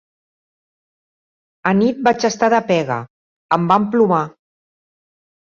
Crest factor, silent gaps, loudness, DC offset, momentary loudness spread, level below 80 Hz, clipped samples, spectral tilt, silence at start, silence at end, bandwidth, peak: 18 dB; 3.10-3.49 s; -17 LUFS; under 0.1%; 9 LU; -60 dBFS; under 0.1%; -6 dB/octave; 1.65 s; 1.15 s; 7.4 kHz; -2 dBFS